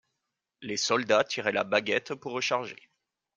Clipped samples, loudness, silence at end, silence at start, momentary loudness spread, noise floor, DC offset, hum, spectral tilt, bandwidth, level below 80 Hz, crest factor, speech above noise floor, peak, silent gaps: under 0.1%; -28 LUFS; 0.6 s; 0.6 s; 11 LU; -84 dBFS; under 0.1%; none; -2.5 dB/octave; 9.6 kHz; -76 dBFS; 22 dB; 56 dB; -8 dBFS; none